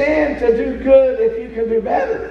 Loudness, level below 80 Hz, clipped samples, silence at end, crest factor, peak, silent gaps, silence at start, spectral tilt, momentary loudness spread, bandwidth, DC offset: -16 LUFS; -38 dBFS; under 0.1%; 0 s; 14 dB; 0 dBFS; none; 0 s; -7.5 dB/octave; 7 LU; 6.4 kHz; under 0.1%